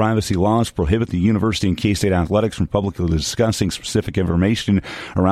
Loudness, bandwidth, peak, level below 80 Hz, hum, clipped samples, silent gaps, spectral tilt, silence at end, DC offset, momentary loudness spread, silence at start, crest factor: -19 LUFS; 14.5 kHz; -2 dBFS; -34 dBFS; none; under 0.1%; none; -6 dB/octave; 0 s; under 0.1%; 3 LU; 0 s; 16 dB